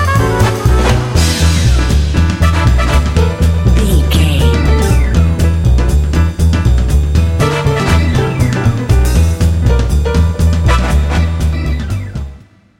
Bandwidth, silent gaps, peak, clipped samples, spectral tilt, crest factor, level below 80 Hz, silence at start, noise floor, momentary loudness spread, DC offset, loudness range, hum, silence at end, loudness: 16 kHz; none; 0 dBFS; under 0.1%; -6 dB/octave; 10 dB; -14 dBFS; 0 s; -36 dBFS; 3 LU; 0.6%; 1 LU; none; 0.45 s; -12 LUFS